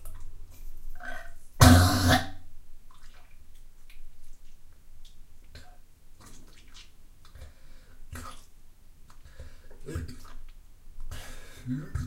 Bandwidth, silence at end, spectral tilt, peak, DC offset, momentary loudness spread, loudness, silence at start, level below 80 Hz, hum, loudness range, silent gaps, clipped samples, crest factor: 16 kHz; 0 s; -5 dB/octave; -2 dBFS; under 0.1%; 32 LU; -23 LUFS; 0 s; -40 dBFS; none; 25 LU; none; under 0.1%; 28 dB